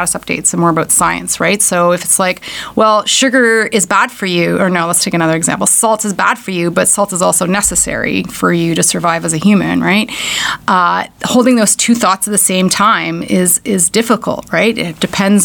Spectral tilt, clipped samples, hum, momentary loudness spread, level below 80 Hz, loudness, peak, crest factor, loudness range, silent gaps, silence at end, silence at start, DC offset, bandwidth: -3 dB/octave; under 0.1%; none; 5 LU; -44 dBFS; -11 LUFS; 0 dBFS; 12 dB; 1 LU; none; 0 s; 0 s; under 0.1%; 20 kHz